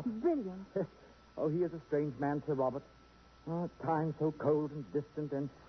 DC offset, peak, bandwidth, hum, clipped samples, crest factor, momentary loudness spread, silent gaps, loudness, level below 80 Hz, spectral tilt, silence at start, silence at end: under 0.1%; -20 dBFS; 6.2 kHz; none; under 0.1%; 16 dB; 7 LU; none; -36 LUFS; -66 dBFS; -8.5 dB/octave; 0 s; 0 s